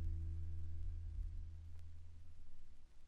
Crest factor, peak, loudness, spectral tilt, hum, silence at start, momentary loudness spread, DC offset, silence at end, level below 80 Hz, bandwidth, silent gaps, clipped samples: 12 dB; -32 dBFS; -51 LUFS; -8 dB/octave; none; 0 s; 18 LU; under 0.1%; 0 s; -48 dBFS; 3.5 kHz; none; under 0.1%